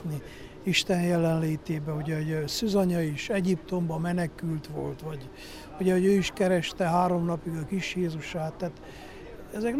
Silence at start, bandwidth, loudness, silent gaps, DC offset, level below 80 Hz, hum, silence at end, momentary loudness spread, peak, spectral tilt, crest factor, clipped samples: 0 s; 15.5 kHz; -28 LUFS; none; under 0.1%; -52 dBFS; none; 0 s; 16 LU; -10 dBFS; -6 dB/octave; 18 dB; under 0.1%